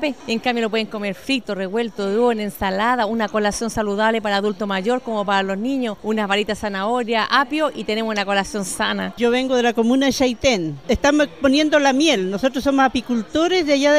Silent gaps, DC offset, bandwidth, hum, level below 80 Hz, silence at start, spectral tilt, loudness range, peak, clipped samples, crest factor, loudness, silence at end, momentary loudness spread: none; 0.5%; 15.5 kHz; none; -44 dBFS; 0 s; -4 dB/octave; 4 LU; -2 dBFS; under 0.1%; 16 dB; -19 LUFS; 0 s; 6 LU